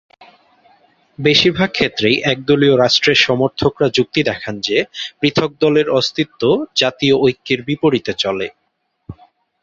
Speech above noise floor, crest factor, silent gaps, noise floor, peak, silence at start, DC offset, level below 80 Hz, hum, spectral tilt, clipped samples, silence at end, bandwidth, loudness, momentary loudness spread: 53 dB; 16 dB; none; -68 dBFS; 0 dBFS; 1.2 s; under 0.1%; -50 dBFS; none; -5 dB/octave; under 0.1%; 0.5 s; 7.8 kHz; -15 LUFS; 8 LU